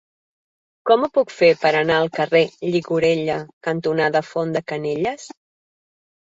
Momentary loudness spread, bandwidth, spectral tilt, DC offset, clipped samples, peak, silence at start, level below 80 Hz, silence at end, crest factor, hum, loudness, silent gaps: 9 LU; 7.8 kHz; -5.5 dB/octave; under 0.1%; under 0.1%; -2 dBFS; 0.85 s; -60 dBFS; 1.05 s; 18 dB; none; -20 LUFS; 3.53-3.61 s